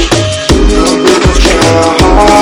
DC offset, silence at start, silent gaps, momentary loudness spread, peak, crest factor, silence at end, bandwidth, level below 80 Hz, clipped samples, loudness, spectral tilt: under 0.1%; 0 s; none; 4 LU; 0 dBFS; 6 dB; 0 s; 18 kHz; -12 dBFS; 7%; -7 LUFS; -4.5 dB/octave